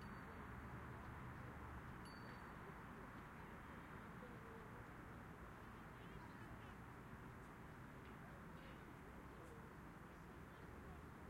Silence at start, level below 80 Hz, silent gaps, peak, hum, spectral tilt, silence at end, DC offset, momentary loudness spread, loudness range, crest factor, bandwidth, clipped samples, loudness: 0 s; -66 dBFS; none; -42 dBFS; none; -6.5 dB/octave; 0 s; under 0.1%; 4 LU; 3 LU; 14 dB; 16 kHz; under 0.1%; -57 LUFS